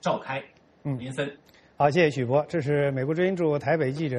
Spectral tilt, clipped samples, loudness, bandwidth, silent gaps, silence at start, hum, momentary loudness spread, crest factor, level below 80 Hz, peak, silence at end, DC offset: -7 dB/octave; under 0.1%; -26 LUFS; 11 kHz; none; 0.05 s; none; 12 LU; 18 dB; -62 dBFS; -8 dBFS; 0 s; under 0.1%